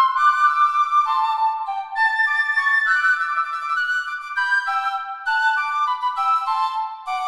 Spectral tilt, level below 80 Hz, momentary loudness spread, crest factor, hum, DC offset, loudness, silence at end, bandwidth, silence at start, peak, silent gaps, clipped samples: 3.5 dB/octave; -72 dBFS; 8 LU; 14 dB; none; 0.1%; -19 LUFS; 0 s; 12.5 kHz; 0 s; -6 dBFS; none; under 0.1%